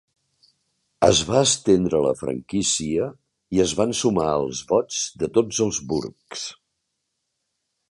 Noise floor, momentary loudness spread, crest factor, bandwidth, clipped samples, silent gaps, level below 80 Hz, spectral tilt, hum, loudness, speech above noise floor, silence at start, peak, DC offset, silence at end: -77 dBFS; 11 LU; 22 dB; 11.5 kHz; under 0.1%; none; -50 dBFS; -4 dB/octave; none; -22 LUFS; 56 dB; 1 s; -2 dBFS; under 0.1%; 1.4 s